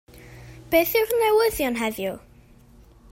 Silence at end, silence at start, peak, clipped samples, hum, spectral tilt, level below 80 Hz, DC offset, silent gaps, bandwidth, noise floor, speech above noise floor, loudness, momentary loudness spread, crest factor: 0.95 s; 0.15 s; -6 dBFS; under 0.1%; none; -3.5 dB/octave; -50 dBFS; under 0.1%; none; 16.5 kHz; -51 dBFS; 30 dB; -22 LUFS; 14 LU; 18 dB